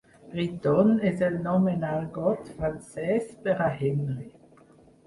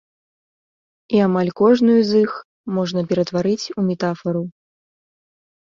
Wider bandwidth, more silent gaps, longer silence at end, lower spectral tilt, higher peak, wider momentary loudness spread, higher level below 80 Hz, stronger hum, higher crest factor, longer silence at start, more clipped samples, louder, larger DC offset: first, 11.5 kHz vs 7.6 kHz; second, none vs 2.45-2.64 s; second, 0.75 s vs 1.25 s; first, -8.5 dB/octave vs -7 dB/octave; second, -10 dBFS vs -4 dBFS; about the same, 11 LU vs 11 LU; first, -54 dBFS vs -62 dBFS; neither; about the same, 18 dB vs 16 dB; second, 0.25 s vs 1.1 s; neither; second, -27 LUFS vs -19 LUFS; neither